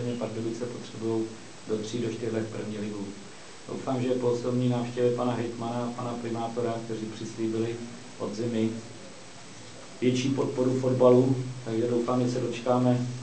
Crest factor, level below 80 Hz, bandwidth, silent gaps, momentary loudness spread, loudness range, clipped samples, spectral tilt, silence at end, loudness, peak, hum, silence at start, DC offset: 20 dB; -68 dBFS; 8 kHz; none; 17 LU; 7 LU; under 0.1%; -6.5 dB/octave; 0 s; -29 LUFS; -8 dBFS; none; 0 s; 0.4%